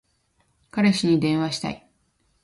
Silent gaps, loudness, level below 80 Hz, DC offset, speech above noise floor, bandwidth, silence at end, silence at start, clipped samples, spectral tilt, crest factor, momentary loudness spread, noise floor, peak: none; -23 LUFS; -60 dBFS; under 0.1%; 46 dB; 11.5 kHz; 0.65 s; 0.75 s; under 0.1%; -5.5 dB/octave; 18 dB; 13 LU; -67 dBFS; -8 dBFS